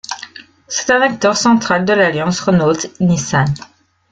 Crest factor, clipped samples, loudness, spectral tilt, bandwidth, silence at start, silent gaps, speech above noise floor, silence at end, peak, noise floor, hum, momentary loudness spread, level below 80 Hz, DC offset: 14 dB; under 0.1%; -14 LUFS; -4.5 dB/octave; 9.2 kHz; 0.1 s; none; 23 dB; 0.45 s; -2 dBFS; -37 dBFS; none; 12 LU; -50 dBFS; under 0.1%